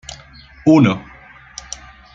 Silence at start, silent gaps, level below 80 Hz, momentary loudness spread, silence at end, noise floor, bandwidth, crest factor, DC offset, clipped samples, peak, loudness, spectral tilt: 0.1 s; none; -46 dBFS; 23 LU; 1.15 s; -42 dBFS; 8.8 kHz; 16 dB; under 0.1%; under 0.1%; -2 dBFS; -15 LUFS; -6.5 dB/octave